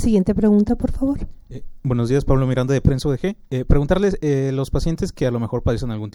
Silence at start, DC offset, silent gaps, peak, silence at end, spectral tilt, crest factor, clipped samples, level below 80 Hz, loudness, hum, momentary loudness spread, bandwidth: 0 s; under 0.1%; none; -2 dBFS; 0.05 s; -8 dB/octave; 18 dB; under 0.1%; -28 dBFS; -20 LUFS; none; 9 LU; 15.5 kHz